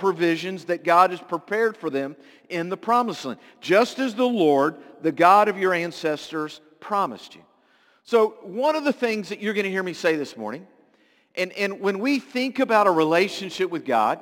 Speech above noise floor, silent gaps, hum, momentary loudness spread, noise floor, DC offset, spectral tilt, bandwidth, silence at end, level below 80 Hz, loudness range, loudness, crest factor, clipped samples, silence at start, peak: 39 dB; none; none; 13 LU; -61 dBFS; under 0.1%; -5 dB/octave; 17 kHz; 0 s; -78 dBFS; 5 LU; -23 LUFS; 20 dB; under 0.1%; 0 s; -2 dBFS